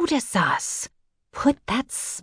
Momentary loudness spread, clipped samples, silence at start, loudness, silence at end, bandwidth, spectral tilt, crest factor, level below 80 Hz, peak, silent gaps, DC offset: 10 LU; under 0.1%; 0 s; -24 LUFS; 0 s; 11 kHz; -3.5 dB/octave; 18 dB; -52 dBFS; -6 dBFS; none; under 0.1%